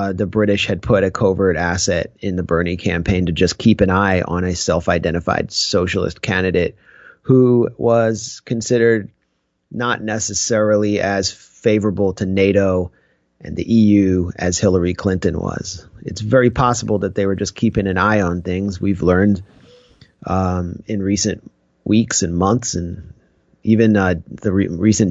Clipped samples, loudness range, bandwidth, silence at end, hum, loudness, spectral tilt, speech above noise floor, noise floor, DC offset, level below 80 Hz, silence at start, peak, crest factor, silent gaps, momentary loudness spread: under 0.1%; 3 LU; 8.2 kHz; 0 s; none; -17 LUFS; -5.5 dB/octave; 52 dB; -68 dBFS; under 0.1%; -40 dBFS; 0 s; -2 dBFS; 16 dB; none; 9 LU